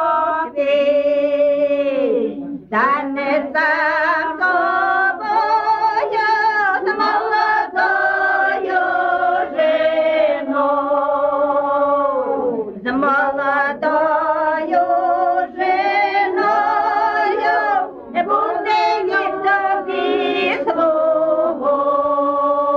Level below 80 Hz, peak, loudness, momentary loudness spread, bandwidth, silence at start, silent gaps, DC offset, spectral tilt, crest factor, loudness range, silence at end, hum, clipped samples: -58 dBFS; -6 dBFS; -17 LUFS; 3 LU; 6.8 kHz; 0 s; none; under 0.1%; -5 dB/octave; 12 dB; 1 LU; 0 s; none; under 0.1%